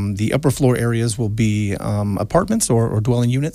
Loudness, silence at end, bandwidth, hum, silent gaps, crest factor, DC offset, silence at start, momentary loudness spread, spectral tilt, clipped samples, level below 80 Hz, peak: -18 LUFS; 0 s; 15.5 kHz; none; none; 14 dB; under 0.1%; 0 s; 4 LU; -6 dB/octave; under 0.1%; -40 dBFS; -2 dBFS